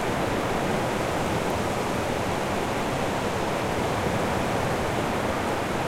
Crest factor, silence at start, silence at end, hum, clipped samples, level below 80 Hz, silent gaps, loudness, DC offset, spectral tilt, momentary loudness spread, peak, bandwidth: 12 dB; 0 s; 0 s; none; under 0.1%; -42 dBFS; none; -26 LUFS; under 0.1%; -5 dB/octave; 1 LU; -14 dBFS; 16.5 kHz